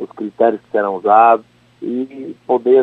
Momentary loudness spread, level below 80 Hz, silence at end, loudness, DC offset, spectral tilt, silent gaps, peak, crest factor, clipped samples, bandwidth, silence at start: 17 LU; -66 dBFS; 0 s; -15 LUFS; under 0.1%; -8 dB/octave; none; 0 dBFS; 14 dB; under 0.1%; 4.2 kHz; 0 s